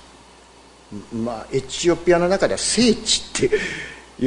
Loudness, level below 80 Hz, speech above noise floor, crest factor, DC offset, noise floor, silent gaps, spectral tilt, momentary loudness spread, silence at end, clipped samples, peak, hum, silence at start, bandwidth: -20 LUFS; -44 dBFS; 27 dB; 18 dB; under 0.1%; -48 dBFS; none; -3.5 dB/octave; 15 LU; 0 s; under 0.1%; -4 dBFS; none; 0.9 s; 11 kHz